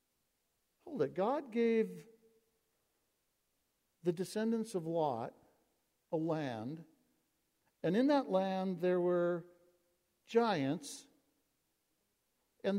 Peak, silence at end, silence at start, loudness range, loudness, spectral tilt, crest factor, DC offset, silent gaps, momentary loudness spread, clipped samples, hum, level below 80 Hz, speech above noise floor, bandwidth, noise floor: -18 dBFS; 0 s; 0.85 s; 6 LU; -36 LUFS; -6.5 dB/octave; 20 dB; under 0.1%; none; 12 LU; under 0.1%; none; -84 dBFS; 47 dB; 16 kHz; -82 dBFS